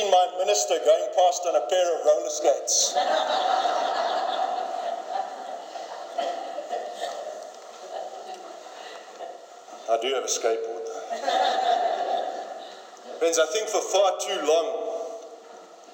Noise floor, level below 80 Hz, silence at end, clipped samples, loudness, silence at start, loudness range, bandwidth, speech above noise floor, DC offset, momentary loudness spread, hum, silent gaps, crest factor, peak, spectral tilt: -46 dBFS; under -90 dBFS; 0 s; under 0.1%; -25 LUFS; 0 s; 12 LU; 17.5 kHz; 23 dB; under 0.1%; 19 LU; none; none; 18 dB; -8 dBFS; 1 dB/octave